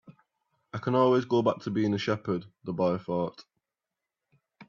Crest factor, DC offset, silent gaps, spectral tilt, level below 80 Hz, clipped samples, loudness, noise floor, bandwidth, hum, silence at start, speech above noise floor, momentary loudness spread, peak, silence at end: 20 dB; under 0.1%; none; -7.5 dB/octave; -70 dBFS; under 0.1%; -28 LUFS; -88 dBFS; 7.2 kHz; none; 0.1 s; 61 dB; 12 LU; -10 dBFS; 0.05 s